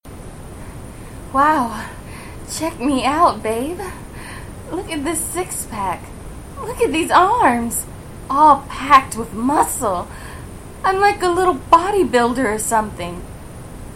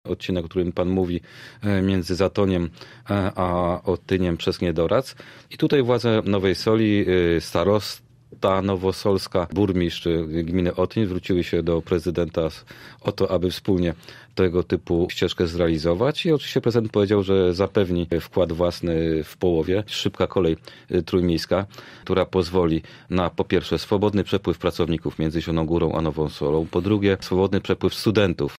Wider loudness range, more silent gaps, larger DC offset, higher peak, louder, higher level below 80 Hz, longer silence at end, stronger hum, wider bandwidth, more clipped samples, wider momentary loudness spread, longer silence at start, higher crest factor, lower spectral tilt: first, 6 LU vs 3 LU; neither; neither; first, 0 dBFS vs -6 dBFS; first, -17 LUFS vs -22 LUFS; first, -38 dBFS vs -44 dBFS; about the same, 0 s vs 0 s; neither; about the same, 16.5 kHz vs 15.5 kHz; neither; first, 22 LU vs 6 LU; about the same, 0.05 s vs 0.05 s; about the same, 18 dB vs 16 dB; second, -4 dB/octave vs -7 dB/octave